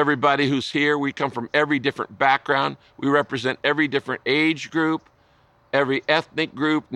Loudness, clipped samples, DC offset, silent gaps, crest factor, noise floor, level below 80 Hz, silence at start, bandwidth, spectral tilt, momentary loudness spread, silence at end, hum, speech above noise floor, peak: -22 LUFS; under 0.1%; under 0.1%; none; 18 dB; -58 dBFS; -66 dBFS; 0 s; 10.5 kHz; -5.5 dB/octave; 6 LU; 0 s; none; 36 dB; -4 dBFS